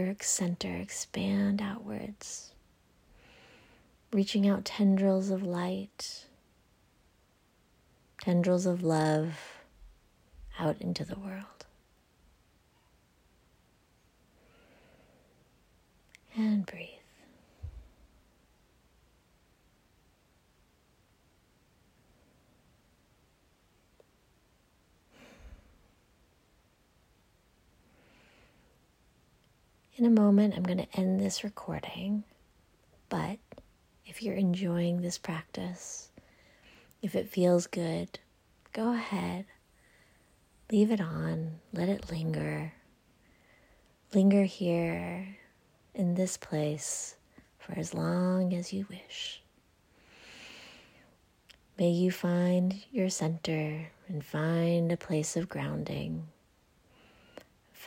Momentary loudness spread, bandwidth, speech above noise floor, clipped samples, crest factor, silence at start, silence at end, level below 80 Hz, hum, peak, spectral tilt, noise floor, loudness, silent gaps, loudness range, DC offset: 20 LU; 16 kHz; 37 dB; under 0.1%; 20 dB; 0 s; 0 s; -64 dBFS; none; -14 dBFS; -6 dB/octave; -68 dBFS; -31 LUFS; none; 9 LU; under 0.1%